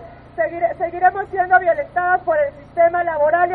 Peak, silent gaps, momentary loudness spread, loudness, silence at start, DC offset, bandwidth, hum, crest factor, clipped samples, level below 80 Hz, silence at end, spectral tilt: 0 dBFS; none; 8 LU; -18 LUFS; 0 s; under 0.1%; 4 kHz; none; 18 dB; under 0.1%; -50 dBFS; 0 s; -8.5 dB/octave